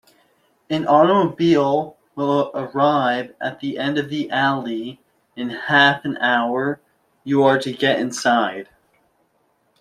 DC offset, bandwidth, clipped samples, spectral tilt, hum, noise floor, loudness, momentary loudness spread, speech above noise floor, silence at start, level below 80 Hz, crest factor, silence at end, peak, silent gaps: under 0.1%; 13 kHz; under 0.1%; -5 dB/octave; none; -65 dBFS; -19 LUFS; 14 LU; 46 dB; 0.7 s; -64 dBFS; 18 dB; 1.2 s; -2 dBFS; none